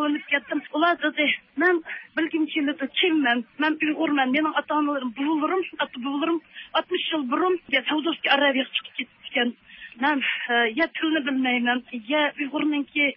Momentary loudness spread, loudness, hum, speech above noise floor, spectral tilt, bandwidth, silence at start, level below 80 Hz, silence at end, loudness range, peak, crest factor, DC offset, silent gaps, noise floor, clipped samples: 6 LU; -24 LUFS; none; 21 dB; -7.5 dB/octave; 5.8 kHz; 0 s; -74 dBFS; 0 s; 2 LU; -8 dBFS; 16 dB; under 0.1%; none; -45 dBFS; under 0.1%